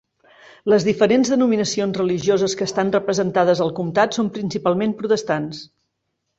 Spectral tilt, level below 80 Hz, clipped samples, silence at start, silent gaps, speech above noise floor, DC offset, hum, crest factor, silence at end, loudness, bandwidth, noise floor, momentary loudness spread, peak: -5 dB/octave; -60 dBFS; under 0.1%; 0.65 s; none; 56 dB; under 0.1%; none; 16 dB; 0.75 s; -19 LUFS; 8 kHz; -75 dBFS; 7 LU; -4 dBFS